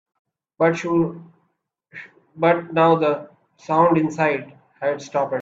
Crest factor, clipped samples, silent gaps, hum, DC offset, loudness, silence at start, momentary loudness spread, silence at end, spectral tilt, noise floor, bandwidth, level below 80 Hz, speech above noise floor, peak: 18 dB; under 0.1%; none; none; under 0.1%; -20 LUFS; 0.6 s; 14 LU; 0 s; -7 dB/octave; -71 dBFS; 7.8 kHz; -64 dBFS; 52 dB; -2 dBFS